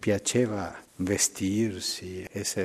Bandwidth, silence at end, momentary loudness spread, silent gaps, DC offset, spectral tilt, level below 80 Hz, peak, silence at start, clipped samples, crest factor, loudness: 15 kHz; 0 s; 10 LU; none; under 0.1%; -3.5 dB/octave; -60 dBFS; -10 dBFS; 0 s; under 0.1%; 18 dB; -28 LUFS